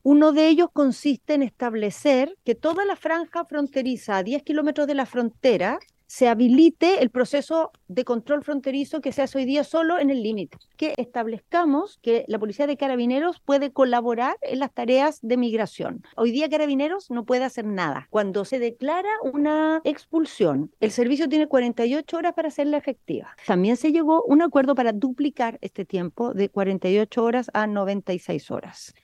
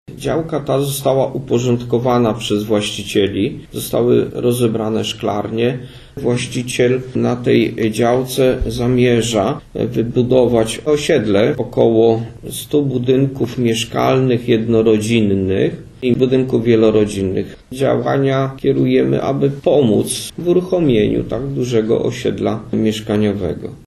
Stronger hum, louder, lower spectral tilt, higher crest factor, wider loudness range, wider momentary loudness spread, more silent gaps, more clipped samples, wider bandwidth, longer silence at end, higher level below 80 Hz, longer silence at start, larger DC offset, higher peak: neither; second, -23 LUFS vs -16 LUFS; about the same, -6 dB/octave vs -6 dB/octave; about the same, 16 dB vs 16 dB; about the same, 4 LU vs 2 LU; about the same, 9 LU vs 7 LU; neither; neither; second, 12 kHz vs 13.5 kHz; about the same, 0.15 s vs 0.1 s; second, -68 dBFS vs -40 dBFS; about the same, 0.05 s vs 0.1 s; neither; second, -6 dBFS vs 0 dBFS